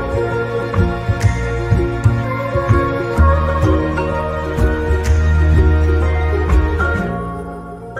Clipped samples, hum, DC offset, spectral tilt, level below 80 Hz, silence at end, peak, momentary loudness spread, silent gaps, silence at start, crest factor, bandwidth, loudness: under 0.1%; none; under 0.1%; -8 dB/octave; -20 dBFS; 0 s; 0 dBFS; 6 LU; none; 0 s; 14 dB; 10 kHz; -16 LUFS